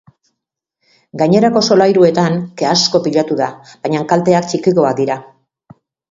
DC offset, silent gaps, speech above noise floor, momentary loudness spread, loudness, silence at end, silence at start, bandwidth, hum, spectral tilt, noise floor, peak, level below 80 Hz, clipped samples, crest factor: under 0.1%; none; 65 dB; 9 LU; -13 LUFS; 0.85 s; 1.15 s; 7.8 kHz; none; -5 dB/octave; -78 dBFS; 0 dBFS; -56 dBFS; under 0.1%; 14 dB